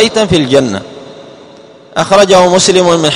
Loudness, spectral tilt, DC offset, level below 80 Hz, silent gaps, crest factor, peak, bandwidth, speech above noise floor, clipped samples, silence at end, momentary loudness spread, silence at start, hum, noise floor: -8 LUFS; -4 dB/octave; under 0.1%; -40 dBFS; none; 10 dB; 0 dBFS; 14 kHz; 28 dB; 1%; 0 s; 14 LU; 0 s; none; -36 dBFS